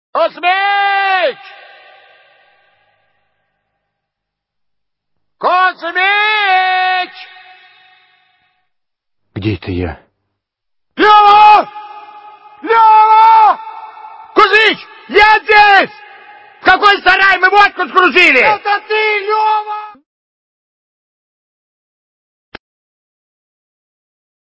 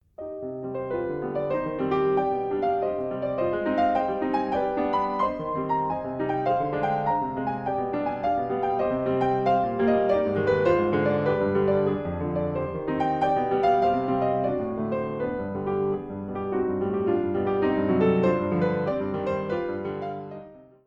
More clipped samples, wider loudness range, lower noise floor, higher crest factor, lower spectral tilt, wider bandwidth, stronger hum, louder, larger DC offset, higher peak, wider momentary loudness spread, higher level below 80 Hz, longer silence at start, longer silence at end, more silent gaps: first, 0.3% vs under 0.1%; first, 13 LU vs 3 LU; first, -77 dBFS vs -45 dBFS; about the same, 14 dB vs 16 dB; second, -4.5 dB/octave vs -9 dB/octave; first, 8 kHz vs 7 kHz; neither; first, -9 LUFS vs -26 LUFS; neither; first, 0 dBFS vs -10 dBFS; first, 16 LU vs 7 LU; first, -44 dBFS vs -52 dBFS; about the same, 0.15 s vs 0.2 s; first, 4.65 s vs 0.25 s; neither